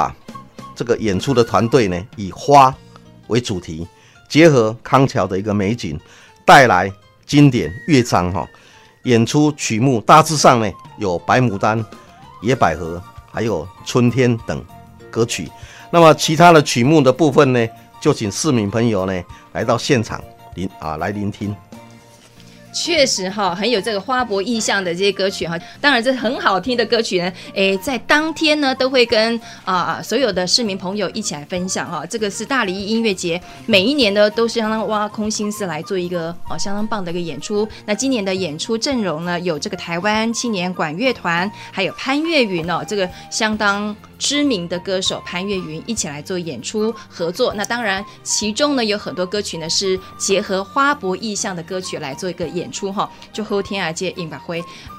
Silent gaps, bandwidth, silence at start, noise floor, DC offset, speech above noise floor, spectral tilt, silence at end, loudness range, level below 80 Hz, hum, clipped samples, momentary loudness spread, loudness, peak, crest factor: none; 16 kHz; 0 s; -44 dBFS; under 0.1%; 27 dB; -4.5 dB/octave; 0 s; 7 LU; -48 dBFS; none; under 0.1%; 13 LU; -17 LUFS; 0 dBFS; 18 dB